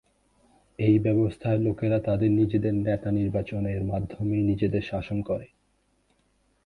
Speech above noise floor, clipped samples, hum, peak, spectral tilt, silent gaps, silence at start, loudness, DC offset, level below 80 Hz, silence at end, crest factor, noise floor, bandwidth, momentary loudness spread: 44 dB; under 0.1%; none; -10 dBFS; -10 dB/octave; none; 0.8 s; -26 LUFS; under 0.1%; -48 dBFS; 1.2 s; 16 dB; -69 dBFS; 4.7 kHz; 8 LU